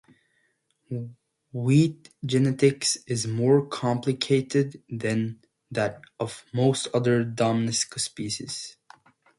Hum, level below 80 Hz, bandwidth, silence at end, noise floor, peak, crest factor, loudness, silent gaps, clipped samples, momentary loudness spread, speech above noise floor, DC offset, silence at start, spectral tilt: none; -64 dBFS; 11.5 kHz; 0.65 s; -71 dBFS; -8 dBFS; 18 dB; -25 LUFS; none; under 0.1%; 14 LU; 46 dB; under 0.1%; 0.9 s; -5 dB/octave